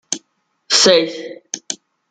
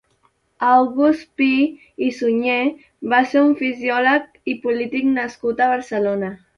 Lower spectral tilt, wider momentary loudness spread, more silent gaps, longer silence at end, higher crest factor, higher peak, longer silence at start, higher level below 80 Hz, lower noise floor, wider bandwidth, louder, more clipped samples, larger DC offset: second, -1.5 dB/octave vs -5.5 dB/octave; first, 18 LU vs 9 LU; neither; first, 0.35 s vs 0.2 s; about the same, 18 dB vs 16 dB; about the same, 0 dBFS vs -2 dBFS; second, 0.1 s vs 0.6 s; about the same, -64 dBFS vs -62 dBFS; about the same, -64 dBFS vs -63 dBFS; first, 11 kHz vs 7 kHz; first, -15 LUFS vs -19 LUFS; neither; neither